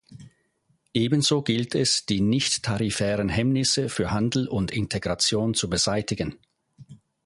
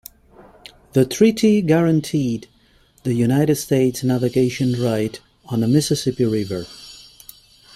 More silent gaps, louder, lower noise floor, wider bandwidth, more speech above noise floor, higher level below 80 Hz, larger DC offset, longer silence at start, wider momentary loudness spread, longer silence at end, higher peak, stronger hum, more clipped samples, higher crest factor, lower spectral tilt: neither; second, -24 LUFS vs -19 LUFS; first, -69 dBFS vs -55 dBFS; second, 11.5 kHz vs 16 kHz; first, 45 dB vs 37 dB; about the same, -48 dBFS vs -52 dBFS; neither; second, 0.1 s vs 0.95 s; second, 6 LU vs 14 LU; second, 0.3 s vs 0.8 s; second, -8 dBFS vs -2 dBFS; neither; neither; about the same, 18 dB vs 18 dB; second, -4 dB/octave vs -6.5 dB/octave